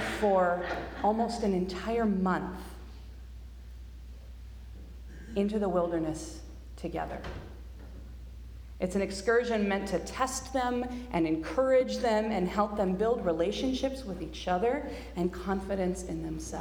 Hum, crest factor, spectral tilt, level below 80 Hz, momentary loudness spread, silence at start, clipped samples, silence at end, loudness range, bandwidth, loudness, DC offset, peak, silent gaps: none; 18 dB; -5.5 dB/octave; -46 dBFS; 21 LU; 0 s; under 0.1%; 0 s; 8 LU; 19.5 kHz; -31 LUFS; under 0.1%; -14 dBFS; none